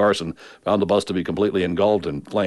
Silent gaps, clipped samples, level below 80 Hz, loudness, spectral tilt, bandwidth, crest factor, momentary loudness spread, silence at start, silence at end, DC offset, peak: none; under 0.1%; -52 dBFS; -21 LUFS; -6 dB/octave; 11.5 kHz; 14 dB; 6 LU; 0 s; 0 s; under 0.1%; -6 dBFS